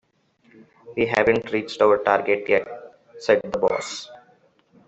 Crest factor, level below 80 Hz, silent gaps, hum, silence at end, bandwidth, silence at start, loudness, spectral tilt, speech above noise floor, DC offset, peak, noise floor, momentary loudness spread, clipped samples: 20 dB; -58 dBFS; none; none; 0.7 s; 8.2 kHz; 0.85 s; -21 LUFS; -4.5 dB/octave; 40 dB; under 0.1%; -2 dBFS; -61 dBFS; 15 LU; under 0.1%